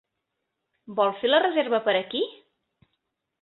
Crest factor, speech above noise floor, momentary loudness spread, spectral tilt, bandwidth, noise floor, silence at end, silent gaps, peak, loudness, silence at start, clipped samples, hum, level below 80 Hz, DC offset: 20 dB; 58 dB; 10 LU; -8 dB/octave; 4.3 kHz; -81 dBFS; 1.1 s; none; -8 dBFS; -24 LUFS; 0.9 s; under 0.1%; none; -76 dBFS; under 0.1%